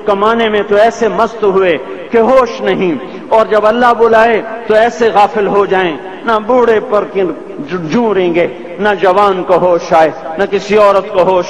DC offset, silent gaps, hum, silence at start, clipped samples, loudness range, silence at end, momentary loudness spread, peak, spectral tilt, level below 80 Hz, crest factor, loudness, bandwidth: 1%; none; none; 0 s; under 0.1%; 2 LU; 0 s; 7 LU; 0 dBFS; -5.5 dB/octave; -44 dBFS; 10 dB; -11 LUFS; 10.5 kHz